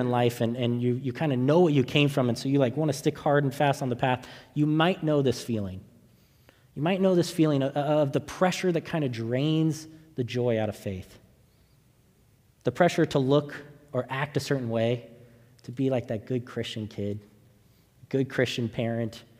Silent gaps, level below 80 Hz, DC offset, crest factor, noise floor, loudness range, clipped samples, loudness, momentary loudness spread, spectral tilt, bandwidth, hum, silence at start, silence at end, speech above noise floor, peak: none; -64 dBFS; under 0.1%; 20 dB; -62 dBFS; 7 LU; under 0.1%; -27 LUFS; 11 LU; -6.5 dB/octave; 16 kHz; none; 0 s; 0.2 s; 36 dB; -6 dBFS